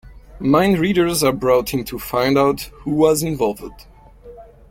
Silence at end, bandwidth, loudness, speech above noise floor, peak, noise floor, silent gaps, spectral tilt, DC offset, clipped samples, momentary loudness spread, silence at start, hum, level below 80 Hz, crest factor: 0.25 s; 17 kHz; -18 LUFS; 24 dB; -2 dBFS; -41 dBFS; none; -5 dB/octave; under 0.1%; under 0.1%; 9 LU; 0.05 s; none; -42 dBFS; 16 dB